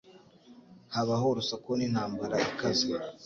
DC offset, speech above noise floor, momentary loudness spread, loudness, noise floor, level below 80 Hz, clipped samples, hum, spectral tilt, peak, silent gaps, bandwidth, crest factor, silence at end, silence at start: under 0.1%; 25 dB; 4 LU; -30 LUFS; -56 dBFS; -64 dBFS; under 0.1%; none; -4.5 dB/octave; -16 dBFS; none; 7.8 kHz; 16 dB; 0 s; 0.05 s